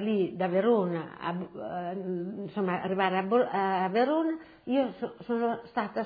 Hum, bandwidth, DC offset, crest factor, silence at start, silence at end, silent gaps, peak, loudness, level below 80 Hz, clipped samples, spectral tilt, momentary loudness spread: none; 5 kHz; under 0.1%; 16 dB; 0 s; 0 s; none; -12 dBFS; -30 LUFS; -72 dBFS; under 0.1%; -9.5 dB/octave; 9 LU